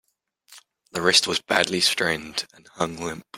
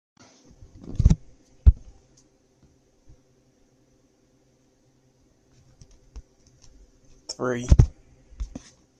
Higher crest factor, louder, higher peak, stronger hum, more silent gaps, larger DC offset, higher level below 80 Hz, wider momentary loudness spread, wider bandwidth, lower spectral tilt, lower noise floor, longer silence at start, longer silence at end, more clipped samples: about the same, 24 dB vs 24 dB; about the same, -22 LUFS vs -24 LUFS; about the same, -2 dBFS vs -2 dBFS; neither; neither; neither; second, -60 dBFS vs -30 dBFS; second, 14 LU vs 26 LU; first, 16.5 kHz vs 8.4 kHz; second, -2 dB/octave vs -7 dB/octave; second, -58 dBFS vs -63 dBFS; second, 0.5 s vs 0.9 s; second, 0 s vs 0.55 s; neither